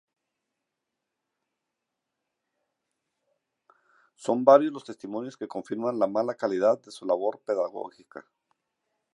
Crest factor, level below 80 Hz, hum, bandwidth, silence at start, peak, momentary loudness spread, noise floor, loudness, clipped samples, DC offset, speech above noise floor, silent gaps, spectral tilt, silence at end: 26 dB; -82 dBFS; none; 11 kHz; 4.2 s; -4 dBFS; 18 LU; -85 dBFS; -26 LUFS; under 0.1%; under 0.1%; 58 dB; none; -6 dB/octave; 0.9 s